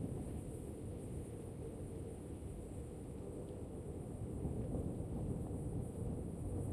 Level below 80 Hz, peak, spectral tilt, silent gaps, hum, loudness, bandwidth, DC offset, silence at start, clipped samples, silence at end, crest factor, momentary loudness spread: -52 dBFS; -28 dBFS; -8 dB/octave; none; none; -46 LUFS; 14.5 kHz; under 0.1%; 0 s; under 0.1%; 0 s; 16 dB; 6 LU